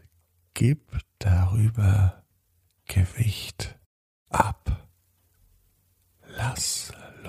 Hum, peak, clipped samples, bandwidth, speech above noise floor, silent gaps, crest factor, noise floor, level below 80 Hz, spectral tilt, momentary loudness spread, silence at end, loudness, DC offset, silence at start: none; -4 dBFS; under 0.1%; 15 kHz; 45 dB; 3.86-4.26 s; 22 dB; -68 dBFS; -40 dBFS; -5 dB/octave; 16 LU; 0 s; -26 LUFS; under 0.1%; 0.55 s